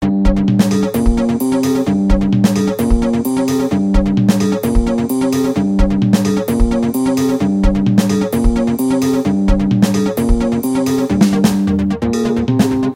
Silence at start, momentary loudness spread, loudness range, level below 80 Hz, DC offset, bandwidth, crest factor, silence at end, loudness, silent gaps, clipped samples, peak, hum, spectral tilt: 0 s; 3 LU; 1 LU; -22 dBFS; under 0.1%; 16.5 kHz; 14 dB; 0 s; -15 LUFS; none; under 0.1%; 0 dBFS; none; -6.5 dB/octave